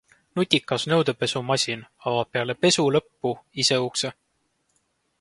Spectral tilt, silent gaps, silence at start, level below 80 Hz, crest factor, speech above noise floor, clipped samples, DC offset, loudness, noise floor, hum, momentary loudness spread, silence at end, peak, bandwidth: -3.5 dB/octave; none; 0.35 s; -64 dBFS; 26 dB; 48 dB; under 0.1%; under 0.1%; -24 LUFS; -71 dBFS; none; 9 LU; 1.1 s; 0 dBFS; 11.5 kHz